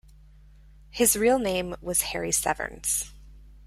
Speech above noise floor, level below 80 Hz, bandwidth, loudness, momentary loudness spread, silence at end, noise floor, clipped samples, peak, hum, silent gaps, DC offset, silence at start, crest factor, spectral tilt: 26 dB; -48 dBFS; 16 kHz; -25 LUFS; 9 LU; 0 s; -51 dBFS; under 0.1%; -8 dBFS; none; none; under 0.1%; 0.95 s; 20 dB; -2.5 dB/octave